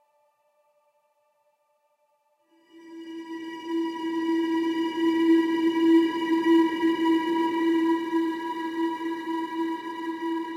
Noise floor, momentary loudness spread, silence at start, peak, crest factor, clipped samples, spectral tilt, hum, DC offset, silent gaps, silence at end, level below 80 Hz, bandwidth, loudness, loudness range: -70 dBFS; 14 LU; 2.75 s; -10 dBFS; 16 dB; under 0.1%; -4.5 dB/octave; none; under 0.1%; none; 0 s; -78 dBFS; 8.6 kHz; -25 LUFS; 13 LU